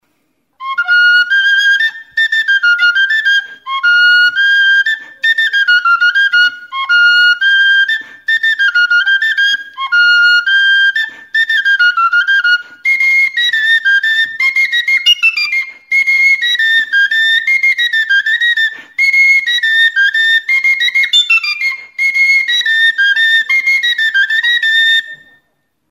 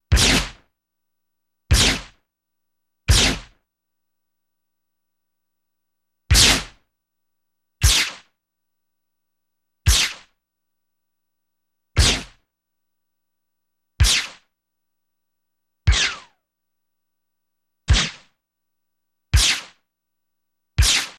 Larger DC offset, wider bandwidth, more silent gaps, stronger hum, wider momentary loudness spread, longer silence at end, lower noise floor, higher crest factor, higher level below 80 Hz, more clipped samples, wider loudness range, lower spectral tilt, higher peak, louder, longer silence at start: neither; about the same, 16 kHz vs 15.5 kHz; neither; second, none vs 60 Hz at -50 dBFS; second, 7 LU vs 15 LU; first, 0.75 s vs 0.05 s; second, -64 dBFS vs -83 dBFS; second, 10 dB vs 22 dB; second, -74 dBFS vs -28 dBFS; neither; second, 1 LU vs 6 LU; second, 4.5 dB/octave vs -2 dB/octave; about the same, 0 dBFS vs -2 dBFS; first, -9 LUFS vs -18 LUFS; first, 0.6 s vs 0.1 s